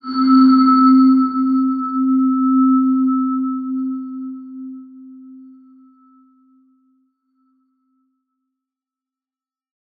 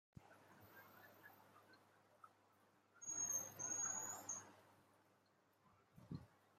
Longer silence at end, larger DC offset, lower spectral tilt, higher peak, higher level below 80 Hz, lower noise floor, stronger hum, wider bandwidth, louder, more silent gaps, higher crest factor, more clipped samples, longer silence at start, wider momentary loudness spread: first, 4.6 s vs 0.25 s; neither; first, -8 dB/octave vs -2 dB/octave; first, -2 dBFS vs -34 dBFS; about the same, -82 dBFS vs -86 dBFS; first, under -90 dBFS vs -78 dBFS; neither; second, 4.8 kHz vs 16 kHz; first, -15 LUFS vs -46 LUFS; neither; second, 14 dB vs 20 dB; neither; about the same, 0.05 s vs 0.15 s; second, 21 LU vs 25 LU